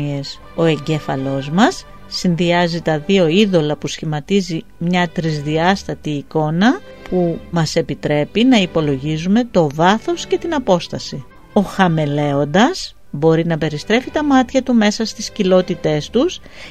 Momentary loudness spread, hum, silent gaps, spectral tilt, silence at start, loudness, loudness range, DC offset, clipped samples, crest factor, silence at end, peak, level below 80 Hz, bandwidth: 9 LU; none; none; -6 dB/octave; 0 s; -17 LUFS; 2 LU; 0.9%; under 0.1%; 16 dB; 0 s; 0 dBFS; -44 dBFS; 13.5 kHz